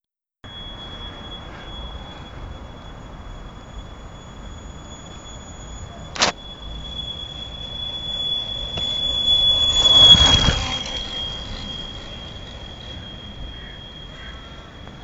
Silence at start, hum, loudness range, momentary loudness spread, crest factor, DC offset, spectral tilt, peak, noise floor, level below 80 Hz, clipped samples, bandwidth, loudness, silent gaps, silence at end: 0.45 s; none; 24 LU; 25 LU; 24 dB; 0.2%; -2.5 dB/octave; 0 dBFS; -46 dBFS; -36 dBFS; under 0.1%; 8 kHz; -16 LUFS; none; 0 s